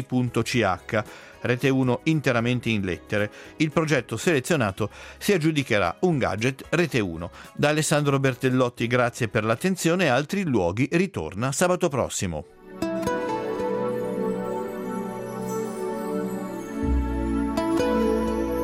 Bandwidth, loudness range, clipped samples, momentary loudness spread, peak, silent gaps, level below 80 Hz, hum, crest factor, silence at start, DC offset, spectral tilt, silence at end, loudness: 16 kHz; 6 LU; under 0.1%; 9 LU; -6 dBFS; none; -42 dBFS; none; 20 dB; 0 s; under 0.1%; -5.5 dB/octave; 0 s; -25 LUFS